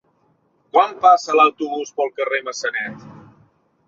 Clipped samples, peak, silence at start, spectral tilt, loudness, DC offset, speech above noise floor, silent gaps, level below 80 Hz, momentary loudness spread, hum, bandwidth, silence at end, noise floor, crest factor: under 0.1%; -2 dBFS; 0.75 s; -3 dB/octave; -18 LUFS; under 0.1%; 44 dB; none; -70 dBFS; 12 LU; none; 7.8 kHz; 0.7 s; -62 dBFS; 18 dB